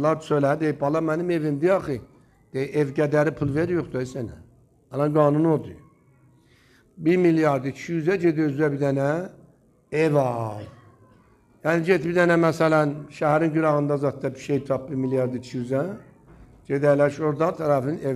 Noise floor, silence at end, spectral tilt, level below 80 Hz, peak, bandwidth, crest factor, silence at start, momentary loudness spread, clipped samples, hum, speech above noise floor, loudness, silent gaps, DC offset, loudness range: -57 dBFS; 0 s; -8 dB/octave; -58 dBFS; -6 dBFS; 13.5 kHz; 18 dB; 0 s; 12 LU; under 0.1%; none; 35 dB; -23 LUFS; none; under 0.1%; 4 LU